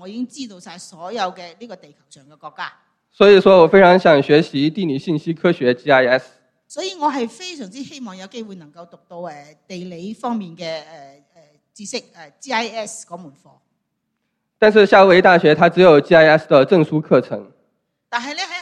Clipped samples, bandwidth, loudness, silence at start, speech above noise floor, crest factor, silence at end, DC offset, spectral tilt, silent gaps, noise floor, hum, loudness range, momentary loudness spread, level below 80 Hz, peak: under 0.1%; 10.5 kHz; -14 LUFS; 0.05 s; 57 dB; 16 dB; 0 s; under 0.1%; -5.5 dB/octave; none; -73 dBFS; none; 18 LU; 23 LU; -58 dBFS; 0 dBFS